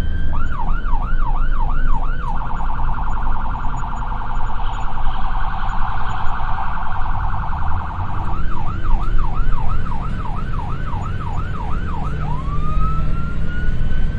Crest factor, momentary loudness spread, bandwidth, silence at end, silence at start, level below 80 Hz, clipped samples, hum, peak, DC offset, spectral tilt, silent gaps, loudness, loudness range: 14 dB; 3 LU; 4 kHz; 0 s; 0 s; -18 dBFS; under 0.1%; none; -2 dBFS; under 0.1%; -7.5 dB/octave; none; -25 LUFS; 1 LU